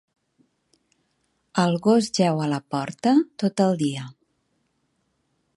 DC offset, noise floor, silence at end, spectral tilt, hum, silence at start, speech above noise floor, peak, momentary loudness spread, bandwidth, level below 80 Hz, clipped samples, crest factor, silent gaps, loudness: under 0.1%; -71 dBFS; 1.45 s; -6 dB/octave; none; 1.55 s; 50 dB; -6 dBFS; 10 LU; 11.5 kHz; -68 dBFS; under 0.1%; 20 dB; none; -22 LUFS